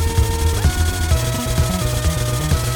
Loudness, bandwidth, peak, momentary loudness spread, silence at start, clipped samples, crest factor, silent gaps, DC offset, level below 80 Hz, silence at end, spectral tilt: -19 LUFS; 19.5 kHz; -4 dBFS; 2 LU; 0 s; under 0.1%; 12 dB; none; under 0.1%; -22 dBFS; 0 s; -4.5 dB/octave